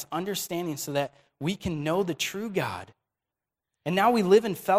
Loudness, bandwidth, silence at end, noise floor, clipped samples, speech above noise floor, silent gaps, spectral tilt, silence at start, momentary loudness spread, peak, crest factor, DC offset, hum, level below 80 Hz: -27 LUFS; 16 kHz; 0 s; -89 dBFS; under 0.1%; 63 dB; none; -5 dB/octave; 0 s; 12 LU; -8 dBFS; 20 dB; under 0.1%; none; -58 dBFS